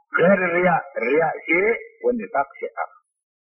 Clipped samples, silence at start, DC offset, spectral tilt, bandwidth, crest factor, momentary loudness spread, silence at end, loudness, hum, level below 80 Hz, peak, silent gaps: under 0.1%; 0.15 s; under 0.1%; -10 dB/octave; 5.6 kHz; 16 dB; 13 LU; 0.65 s; -21 LUFS; none; -58 dBFS; -6 dBFS; none